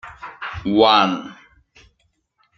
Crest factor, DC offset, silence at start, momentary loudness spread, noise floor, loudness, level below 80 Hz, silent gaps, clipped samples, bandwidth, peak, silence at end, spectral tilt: 20 dB; under 0.1%; 0.05 s; 22 LU; -67 dBFS; -17 LUFS; -52 dBFS; none; under 0.1%; 7.4 kHz; -2 dBFS; 1.25 s; -5.5 dB/octave